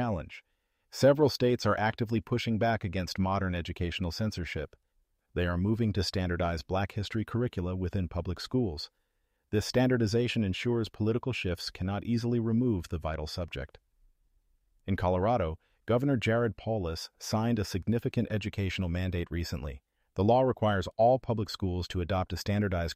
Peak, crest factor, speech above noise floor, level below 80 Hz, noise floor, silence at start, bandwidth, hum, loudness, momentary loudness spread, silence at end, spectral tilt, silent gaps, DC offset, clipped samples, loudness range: -12 dBFS; 18 dB; 44 dB; -48 dBFS; -74 dBFS; 0 s; 15.5 kHz; none; -30 LUFS; 11 LU; 0 s; -6.5 dB/octave; none; under 0.1%; under 0.1%; 4 LU